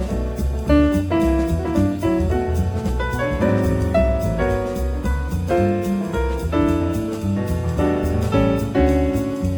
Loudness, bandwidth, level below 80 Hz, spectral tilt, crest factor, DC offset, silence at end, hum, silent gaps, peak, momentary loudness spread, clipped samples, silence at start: -20 LUFS; over 20 kHz; -26 dBFS; -7.5 dB/octave; 14 dB; under 0.1%; 0 s; none; none; -4 dBFS; 5 LU; under 0.1%; 0 s